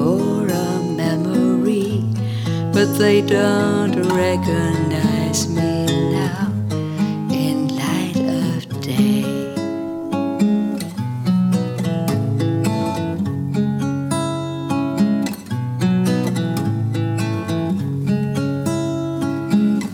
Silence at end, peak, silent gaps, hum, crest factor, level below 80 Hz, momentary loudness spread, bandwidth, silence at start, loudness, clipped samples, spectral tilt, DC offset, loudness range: 0 s; -4 dBFS; none; none; 16 dB; -56 dBFS; 6 LU; 17.5 kHz; 0 s; -19 LUFS; under 0.1%; -6.5 dB/octave; under 0.1%; 3 LU